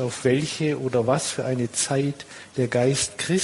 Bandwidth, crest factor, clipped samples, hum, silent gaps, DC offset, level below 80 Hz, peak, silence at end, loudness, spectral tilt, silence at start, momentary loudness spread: 11.5 kHz; 18 dB; under 0.1%; none; none; under 0.1%; -58 dBFS; -6 dBFS; 0 s; -24 LUFS; -4.5 dB/octave; 0 s; 6 LU